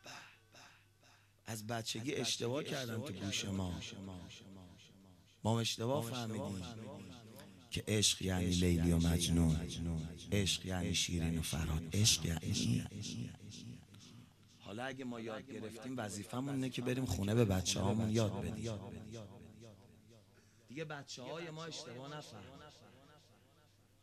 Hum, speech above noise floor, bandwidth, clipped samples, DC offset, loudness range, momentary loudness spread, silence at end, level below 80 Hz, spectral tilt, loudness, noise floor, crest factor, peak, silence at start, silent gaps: none; 30 dB; 13.5 kHz; under 0.1%; under 0.1%; 14 LU; 22 LU; 0.85 s; -54 dBFS; -4.5 dB/octave; -38 LUFS; -68 dBFS; 22 dB; -16 dBFS; 0.05 s; none